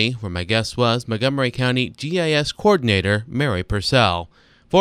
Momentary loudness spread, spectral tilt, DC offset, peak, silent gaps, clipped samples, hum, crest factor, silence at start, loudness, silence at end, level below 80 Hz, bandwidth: 6 LU; -5.5 dB/octave; under 0.1%; 0 dBFS; none; under 0.1%; none; 20 dB; 0 s; -20 LUFS; 0 s; -42 dBFS; 14.5 kHz